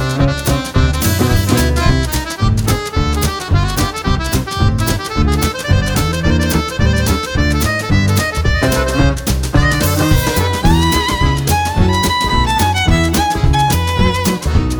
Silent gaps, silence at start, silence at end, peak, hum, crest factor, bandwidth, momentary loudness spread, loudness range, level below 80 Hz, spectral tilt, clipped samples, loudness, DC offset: none; 0 s; 0 s; 0 dBFS; none; 12 dB; over 20 kHz; 4 LU; 2 LU; -20 dBFS; -5 dB/octave; under 0.1%; -14 LUFS; under 0.1%